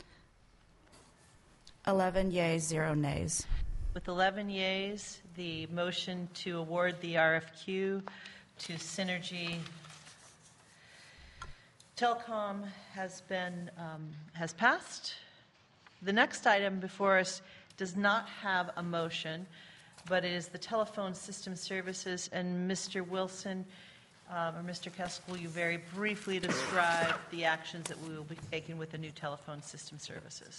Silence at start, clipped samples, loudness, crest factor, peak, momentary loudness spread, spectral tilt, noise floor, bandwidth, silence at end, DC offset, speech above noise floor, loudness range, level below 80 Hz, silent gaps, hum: 0 s; under 0.1%; -35 LUFS; 24 dB; -12 dBFS; 17 LU; -4 dB/octave; -64 dBFS; 11.5 kHz; 0 s; under 0.1%; 29 dB; 8 LU; -52 dBFS; none; none